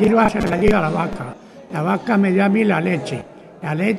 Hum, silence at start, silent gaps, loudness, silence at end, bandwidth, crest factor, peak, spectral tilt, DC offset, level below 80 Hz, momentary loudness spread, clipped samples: none; 0 s; none; -18 LUFS; 0 s; 12 kHz; 16 dB; -2 dBFS; -7.5 dB/octave; under 0.1%; -38 dBFS; 14 LU; under 0.1%